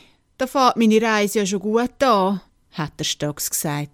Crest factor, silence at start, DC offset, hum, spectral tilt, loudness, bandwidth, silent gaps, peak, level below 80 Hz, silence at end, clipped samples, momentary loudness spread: 18 dB; 0.4 s; under 0.1%; none; -4 dB/octave; -20 LUFS; 18 kHz; none; -2 dBFS; -54 dBFS; 0.05 s; under 0.1%; 13 LU